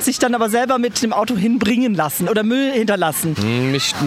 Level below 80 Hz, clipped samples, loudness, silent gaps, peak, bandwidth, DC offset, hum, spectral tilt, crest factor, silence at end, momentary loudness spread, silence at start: -54 dBFS; under 0.1%; -17 LUFS; none; -4 dBFS; 16 kHz; under 0.1%; none; -4.5 dB/octave; 14 dB; 0 s; 2 LU; 0 s